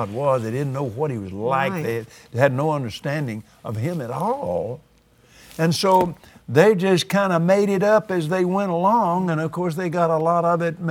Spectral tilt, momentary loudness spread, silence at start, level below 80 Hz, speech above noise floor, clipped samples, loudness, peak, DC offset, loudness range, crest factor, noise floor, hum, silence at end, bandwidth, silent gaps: -6.5 dB/octave; 10 LU; 0 s; -58 dBFS; 34 dB; under 0.1%; -21 LUFS; 0 dBFS; under 0.1%; 6 LU; 20 dB; -54 dBFS; none; 0 s; 18.5 kHz; none